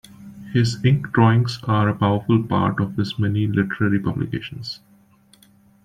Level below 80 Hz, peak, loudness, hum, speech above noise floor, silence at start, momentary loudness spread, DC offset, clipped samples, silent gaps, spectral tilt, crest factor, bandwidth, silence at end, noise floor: -52 dBFS; -4 dBFS; -20 LUFS; none; 35 dB; 0.2 s; 13 LU; under 0.1%; under 0.1%; none; -7.5 dB/octave; 18 dB; 10 kHz; 1.1 s; -54 dBFS